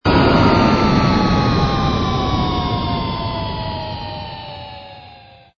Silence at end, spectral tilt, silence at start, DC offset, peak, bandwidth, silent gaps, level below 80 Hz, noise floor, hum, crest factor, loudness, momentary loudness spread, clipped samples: 0.4 s; -7 dB/octave; 0.05 s; under 0.1%; 0 dBFS; 7.2 kHz; none; -30 dBFS; -43 dBFS; none; 16 dB; -17 LUFS; 18 LU; under 0.1%